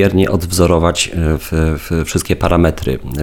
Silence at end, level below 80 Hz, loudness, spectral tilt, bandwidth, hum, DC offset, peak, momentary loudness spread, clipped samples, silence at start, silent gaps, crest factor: 0 s; -24 dBFS; -15 LUFS; -5.5 dB/octave; 18.5 kHz; none; under 0.1%; 0 dBFS; 6 LU; under 0.1%; 0 s; none; 14 dB